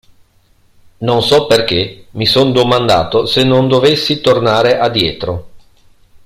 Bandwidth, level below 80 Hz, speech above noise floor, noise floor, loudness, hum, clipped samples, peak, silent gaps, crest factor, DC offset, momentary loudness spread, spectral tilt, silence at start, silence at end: 15.5 kHz; -42 dBFS; 39 dB; -51 dBFS; -12 LUFS; none; under 0.1%; 0 dBFS; none; 14 dB; under 0.1%; 8 LU; -5.5 dB/octave; 1 s; 0.65 s